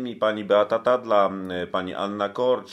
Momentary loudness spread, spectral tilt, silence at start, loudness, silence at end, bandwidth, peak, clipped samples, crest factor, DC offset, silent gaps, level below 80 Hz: 8 LU; -6 dB/octave; 0 s; -23 LUFS; 0 s; 9 kHz; -6 dBFS; under 0.1%; 18 dB; under 0.1%; none; -68 dBFS